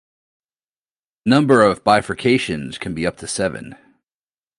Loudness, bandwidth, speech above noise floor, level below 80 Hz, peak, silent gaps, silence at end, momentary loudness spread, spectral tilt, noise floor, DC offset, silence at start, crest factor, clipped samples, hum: -18 LUFS; 11.5 kHz; over 73 dB; -50 dBFS; 0 dBFS; none; 0.85 s; 12 LU; -5 dB/octave; under -90 dBFS; under 0.1%; 1.25 s; 20 dB; under 0.1%; none